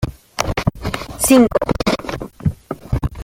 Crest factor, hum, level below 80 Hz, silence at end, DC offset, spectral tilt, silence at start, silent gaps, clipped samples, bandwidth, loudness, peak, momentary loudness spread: 16 dB; none; -32 dBFS; 0 s; under 0.1%; -5 dB/octave; 0 s; none; under 0.1%; 17 kHz; -18 LUFS; -2 dBFS; 14 LU